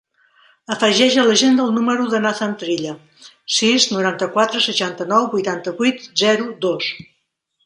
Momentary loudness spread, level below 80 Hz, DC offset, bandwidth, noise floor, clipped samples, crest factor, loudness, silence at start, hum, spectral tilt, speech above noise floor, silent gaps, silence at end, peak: 11 LU; -66 dBFS; under 0.1%; 11.5 kHz; -69 dBFS; under 0.1%; 18 dB; -17 LUFS; 0.7 s; none; -3 dB/octave; 52 dB; none; 0.6 s; -2 dBFS